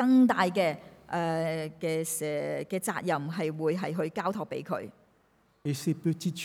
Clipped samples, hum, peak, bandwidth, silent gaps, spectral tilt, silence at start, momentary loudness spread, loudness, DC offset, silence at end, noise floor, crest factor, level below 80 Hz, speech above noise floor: under 0.1%; none; -12 dBFS; 16.5 kHz; none; -5.5 dB/octave; 0 s; 10 LU; -30 LUFS; under 0.1%; 0 s; -67 dBFS; 18 dB; -72 dBFS; 38 dB